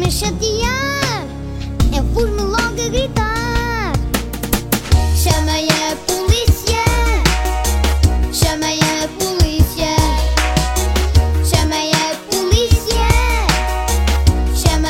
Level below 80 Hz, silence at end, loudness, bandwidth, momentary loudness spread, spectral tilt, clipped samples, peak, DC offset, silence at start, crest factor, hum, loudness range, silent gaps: -18 dBFS; 0 s; -16 LUFS; 16.5 kHz; 4 LU; -4.5 dB/octave; under 0.1%; 0 dBFS; under 0.1%; 0 s; 14 dB; none; 3 LU; none